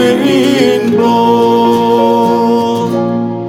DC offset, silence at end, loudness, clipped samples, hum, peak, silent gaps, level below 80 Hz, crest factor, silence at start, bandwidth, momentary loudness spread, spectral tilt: under 0.1%; 0 s; -10 LUFS; under 0.1%; none; 0 dBFS; none; -52 dBFS; 10 dB; 0 s; 16 kHz; 5 LU; -6 dB/octave